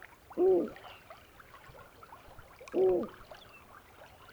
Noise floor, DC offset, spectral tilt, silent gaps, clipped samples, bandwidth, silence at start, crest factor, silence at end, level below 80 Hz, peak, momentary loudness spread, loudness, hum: -55 dBFS; under 0.1%; -7 dB/octave; none; under 0.1%; over 20 kHz; 0.3 s; 16 dB; 0.3 s; -64 dBFS; -18 dBFS; 26 LU; -31 LUFS; none